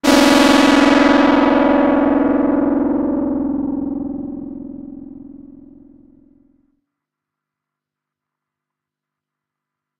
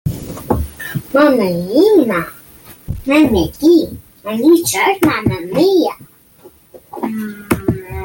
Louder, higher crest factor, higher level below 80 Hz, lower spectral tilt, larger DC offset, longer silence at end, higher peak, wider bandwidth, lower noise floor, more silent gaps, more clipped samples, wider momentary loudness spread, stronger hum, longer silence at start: about the same, -14 LUFS vs -14 LUFS; about the same, 16 dB vs 14 dB; second, -44 dBFS vs -36 dBFS; second, -4 dB/octave vs -5.5 dB/octave; neither; first, 4.45 s vs 0 s; about the same, -2 dBFS vs -2 dBFS; about the same, 15.5 kHz vs 17 kHz; first, -84 dBFS vs -44 dBFS; neither; neither; first, 21 LU vs 14 LU; neither; about the same, 0.05 s vs 0.05 s